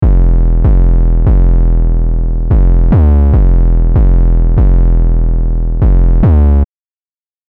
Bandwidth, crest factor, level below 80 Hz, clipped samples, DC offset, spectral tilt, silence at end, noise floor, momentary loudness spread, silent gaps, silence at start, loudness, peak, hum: 2.2 kHz; 4 dB; -8 dBFS; under 0.1%; 3%; -13 dB/octave; 0.85 s; under -90 dBFS; 6 LU; none; 0 s; -11 LUFS; -4 dBFS; none